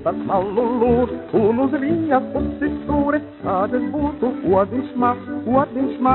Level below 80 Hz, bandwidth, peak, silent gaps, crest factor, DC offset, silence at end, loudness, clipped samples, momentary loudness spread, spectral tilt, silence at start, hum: -42 dBFS; 4.2 kHz; -2 dBFS; none; 16 dB; under 0.1%; 0 s; -20 LUFS; under 0.1%; 5 LU; -7 dB/octave; 0 s; none